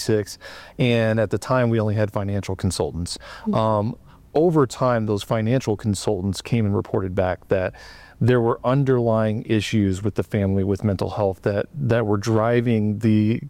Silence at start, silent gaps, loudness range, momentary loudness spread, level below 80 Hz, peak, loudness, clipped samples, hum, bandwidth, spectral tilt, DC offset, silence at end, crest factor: 0 s; none; 2 LU; 7 LU; -48 dBFS; -6 dBFS; -22 LUFS; under 0.1%; none; 14.5 kHz; -7 dB/octave; under 0.1%; 0 s; 14 dB